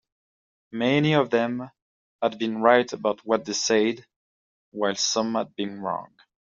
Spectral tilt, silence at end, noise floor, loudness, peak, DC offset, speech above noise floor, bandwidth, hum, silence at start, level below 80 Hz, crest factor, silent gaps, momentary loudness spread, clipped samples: -3.5 dB/octave; 0.4 s; under -90 dBFS; -24 LUFS; -2 dBFS; under 0.1%; over 66 dB; 7.8 kHz; none; 0.75 s; -70 dBFS; 22 dB; 1.82-2.19 s, 4.16-4.72 s; 14 LU; under 0.1%